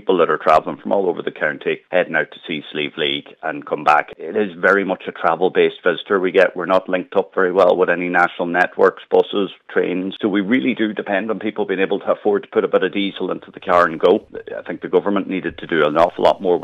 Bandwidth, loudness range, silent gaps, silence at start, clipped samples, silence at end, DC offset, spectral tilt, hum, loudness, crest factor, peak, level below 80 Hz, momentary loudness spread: 8.2 kHz; 3 LU; none; 0.05 s; under 0.1%; 0 s; under 0.1%; -6.5 dB/octave; none; -18 LUFS; 16 dB; -2 dBFS; -58 dBFS; 9 LU